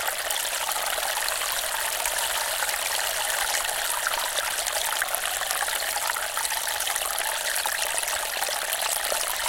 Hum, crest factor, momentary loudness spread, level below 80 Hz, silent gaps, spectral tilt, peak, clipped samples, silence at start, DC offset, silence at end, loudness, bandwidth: none; 22 dB; 1 LU; -54 dBFS; none; 2 dB/octave; -4 dBFS; under 0.1%; 0 s; under 0.1%; 0 s; -25 LUFS; 17 kHz